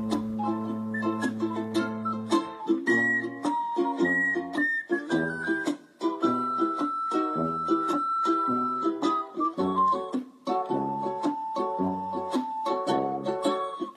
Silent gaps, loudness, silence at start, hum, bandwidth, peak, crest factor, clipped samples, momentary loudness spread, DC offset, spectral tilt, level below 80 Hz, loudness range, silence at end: none; -28 LUFS; 0 s; none; 12 kHz; -12 dBFS; 16 dB; under 0.1%; 6 LU; under 0.1%; -5.5 dB/octave; -68 dBFS; 3 LU; 0 s